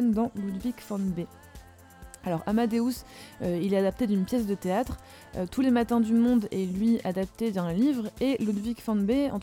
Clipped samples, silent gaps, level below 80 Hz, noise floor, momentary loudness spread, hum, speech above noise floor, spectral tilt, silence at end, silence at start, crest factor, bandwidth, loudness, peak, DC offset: under 0.1%; none; -50 dBFS; -49 dBFS; 11 LU; none; 22 dB; -7 dB/octave; 0 s; 0 s; 16 dB; 17 kHz; -28 LUFS; -12 dBFS; under 0.1%